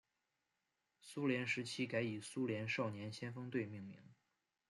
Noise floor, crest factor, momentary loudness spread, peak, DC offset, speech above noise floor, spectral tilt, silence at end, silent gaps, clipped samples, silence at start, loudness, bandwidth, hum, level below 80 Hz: -88 dBFS; 20 dB; 13 LU; -24 dBFS; under 0.1%; 46 dB; -5.5 dB/octave; 0.55 s; none; under 0.1%; 1.05 s; -42 LUFS; 12 kHz; none; -84 dBFS